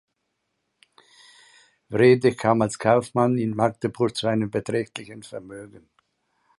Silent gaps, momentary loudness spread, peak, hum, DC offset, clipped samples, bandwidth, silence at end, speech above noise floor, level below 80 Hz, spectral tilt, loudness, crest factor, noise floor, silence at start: none; 20 LU; -4 dBFS; none; under 0.1%; under 0.1%; 11.5 kHz; 0.8 s; 54 dB; -60 dBFS; -6.5 dB/octave; -22 LUFS; 20 dB; -77 dBFS; 1.9 s